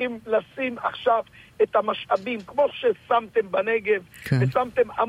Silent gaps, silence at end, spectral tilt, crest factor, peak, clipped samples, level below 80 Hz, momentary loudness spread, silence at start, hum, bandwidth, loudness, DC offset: none; 0 s; -7 dB/octave; 14 dB; -10 dBFS; under 0.1%; -60 dBFS; 4 LU; 0 s; none; 15.5 kHz; -24 LUFS; under 0.1%